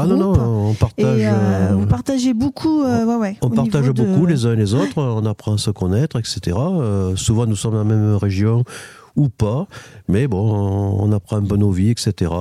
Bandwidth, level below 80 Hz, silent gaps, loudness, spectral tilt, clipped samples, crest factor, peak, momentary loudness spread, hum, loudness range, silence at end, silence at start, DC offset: 12.5 kHz; -38 dBFS; none; -18 LUFS; -7 dB/octave; under 0.1%; 14 dB; -2 dBFS; 5 LU; none; 2 LU; 0 s; 0 s; under 0.1%